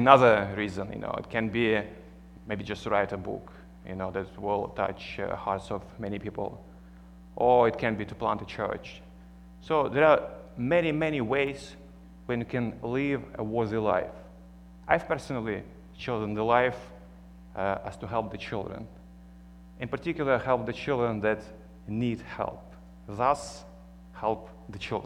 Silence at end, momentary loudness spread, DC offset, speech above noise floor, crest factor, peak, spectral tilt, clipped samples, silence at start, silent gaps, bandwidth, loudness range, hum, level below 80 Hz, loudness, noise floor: 0 s; 21 LU; under 0.1%; 21 dB; 28 dB; -2 dBFS; -6.5 dB/octave; under 0.1%; 0 s; none; 11.5 kHz; 6 LU; 60 Hz at -50 dBFS; -52 dBFS; -29 LUFS; -49 dBFS